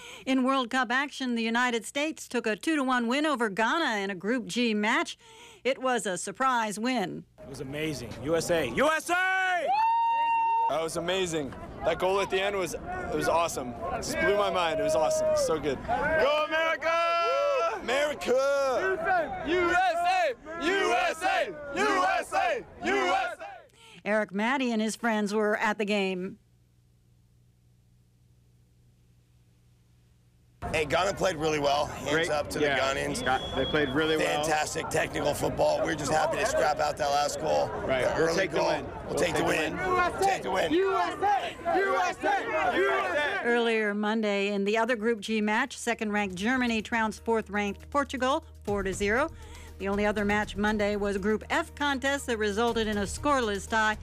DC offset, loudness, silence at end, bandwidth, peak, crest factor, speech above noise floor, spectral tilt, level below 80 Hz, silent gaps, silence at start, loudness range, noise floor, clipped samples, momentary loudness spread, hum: under 0.1%; -27 LUFS; 0 s; 15.5 kHz; -16 dBFS; 12 dB; 35 dB; -4 dB/octave; -52 dBFS; none; 0 s; 3 LU; -63 dBFS; under 0.1%; 6 LU; none